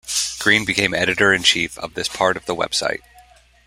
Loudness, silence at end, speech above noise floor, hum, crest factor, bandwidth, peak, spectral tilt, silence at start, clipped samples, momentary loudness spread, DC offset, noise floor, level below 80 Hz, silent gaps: -18 LUFS; 0.7 s; 31 dB; none; 20 dB; 16 kHz; 0 dBFS; -2 dB/octave; 0.05 s; under 0.1%; 11 LU; under 0.1%; -50 dBFS; -50 dBFS; none